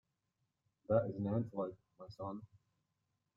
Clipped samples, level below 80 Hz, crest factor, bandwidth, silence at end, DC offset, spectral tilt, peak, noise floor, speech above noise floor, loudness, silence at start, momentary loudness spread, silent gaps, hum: under 0.1%; -74 dBFS; 24 dB; 6.8 kHz; 0.9 s; under 0.1%; -9.5 dB/octave; -18 dBFS; -86 dBFS; 47 dB; -40 LUFS; 0.9 s; 18 LU; none; none